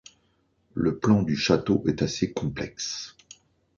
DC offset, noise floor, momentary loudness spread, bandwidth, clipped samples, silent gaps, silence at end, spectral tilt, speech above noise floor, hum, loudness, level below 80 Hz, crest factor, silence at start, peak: under 0.1%; -68 dBFS; 11 LU; 7.4 kHz; under 0.1%; none; 0.7 s; -5.5 dB/octave; 43 dB; none; -26 LUFS; -52 dBFS; 20 dB; 0.75 s; -6 dBFS